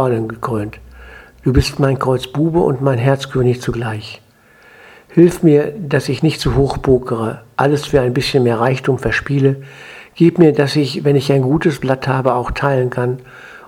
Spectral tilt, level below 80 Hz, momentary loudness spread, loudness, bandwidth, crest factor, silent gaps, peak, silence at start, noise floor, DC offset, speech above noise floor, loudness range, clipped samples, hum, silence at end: -7 dB/octave; -34 dBFS; 10 LU; -15 LUFS; 15.5 kHz; 16 dB; none; 0 dBFS; 0 s; -47 dBFS; under 0.1%; 32 dB; 2 LU; under 0.1%; none; 0.1 s